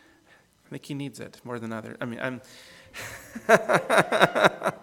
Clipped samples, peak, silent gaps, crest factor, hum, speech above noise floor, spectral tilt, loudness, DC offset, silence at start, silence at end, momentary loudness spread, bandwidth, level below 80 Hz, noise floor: under 0.1%; 0 dBFS; none; 26 dB; none; 34 dB; -4.5 dB/octave; -24 LUFS; under 0.1%; 0.7 s; 0.05 s; 21 LU; 19 kHz; -66 dBFS; -59 dBFS